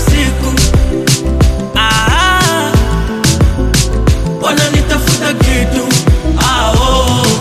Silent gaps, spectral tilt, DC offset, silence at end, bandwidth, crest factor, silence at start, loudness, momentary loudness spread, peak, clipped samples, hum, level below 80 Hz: none; -4 dB/octave; under 0.1%; 0 s; 15.5 kHz; 10 dB; 0 s; -11 LUFS; 3 LU; 0 dBFS; under 0.1%; none; -14 dBFS